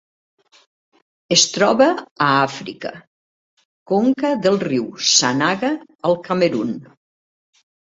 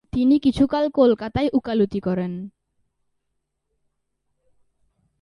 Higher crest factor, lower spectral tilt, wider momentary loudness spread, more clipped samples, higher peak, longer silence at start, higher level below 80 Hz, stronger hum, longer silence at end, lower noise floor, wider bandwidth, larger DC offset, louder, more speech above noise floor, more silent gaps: about the same, 20 dB vs 18 dB; second, -3 dB/octave vs -8 dB/octave; about the same, 13 LU vs 11 LU; neither; first, 0 dBFS vs -6 dBFS; first, 1.3 s vs 0.15 s; second, -62 dBFS vs -48 dBFS; neither; second, 1.1 s vs 2.75 s; first, under -90 dBFS vs -76 dBFS; second, 8.2 kHz vs 11 kHz; neither; first, -17 LUFS vs -20 LUFS; first, over 72 dB vs 56 dB; first, 2.11-2.16 s, 3.07-3.57 s, 3.65-3.86 s, 5.95-5.99 s vs none